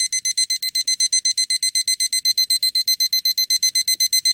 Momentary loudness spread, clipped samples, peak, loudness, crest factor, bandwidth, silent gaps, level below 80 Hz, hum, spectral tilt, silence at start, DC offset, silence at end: 3 LU; under 0.1%; -6 dBFS; -17 LUFS; 14 dB; 17.5 kHz; none; -74 dBFS; none; 6.5 dB/octave; 0 s; under 0.1%; 0 s